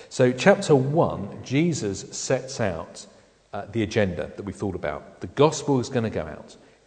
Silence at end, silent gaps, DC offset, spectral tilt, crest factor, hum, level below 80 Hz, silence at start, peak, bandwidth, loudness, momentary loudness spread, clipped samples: 0.35 s; none; under 0.1%; -5.5 dB/octave; 22 dB; none; -54 dBFS; 0 s; -2 dBFS; 9.4 kHz; -24 LUFS; 16 LU; under 0.1%